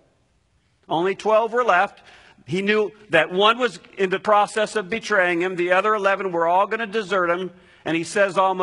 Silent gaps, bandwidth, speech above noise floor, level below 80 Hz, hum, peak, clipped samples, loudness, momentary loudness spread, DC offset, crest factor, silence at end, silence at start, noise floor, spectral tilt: none; 11 kHz; 43 dB; -66 dBFS; none; -2 dBFS; under 0.1%; -21 LUFS; 8 LU; under 0.1%; 20 dB; 0 s; 0.9 s; -64 dBFS; -4.5 dB/octave